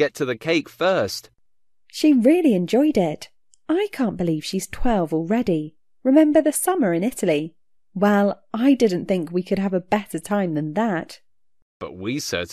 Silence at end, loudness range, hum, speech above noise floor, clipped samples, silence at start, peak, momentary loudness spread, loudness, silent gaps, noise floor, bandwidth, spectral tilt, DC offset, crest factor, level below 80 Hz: 0 s; 4 LU; none; 59 dB; under 0.1%; 0 s; -4 dBFS; 11 LU; -21 LUFS; 11.62-11.80 s; -80 dBFS; 14 kHz; -5.5 dB/octave; 0.2%; 18 dB; -44 dBFS